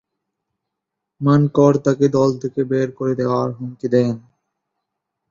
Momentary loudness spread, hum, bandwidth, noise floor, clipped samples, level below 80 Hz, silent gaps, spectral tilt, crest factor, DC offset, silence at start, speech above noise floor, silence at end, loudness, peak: 9 LU; none; 7.4 kHz; -81 dBFS; under 0.1%; -60 dBFS; none; -8.5 dB/octave; 18 dB; under 0.1%; 1.2 s; 64 dB; 1.1 s; -18 LUFS; -2 dBFS